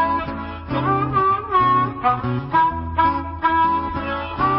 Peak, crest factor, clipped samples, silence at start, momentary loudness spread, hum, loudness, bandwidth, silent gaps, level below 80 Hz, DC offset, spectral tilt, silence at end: -6 dBFS; 14 dB; under 0.1%; 0 s; 8 LU; none; -20 LUFS; 5.8 kHz; none; -36 dBFS; under 0.1%; -11 dB/octave; 0 s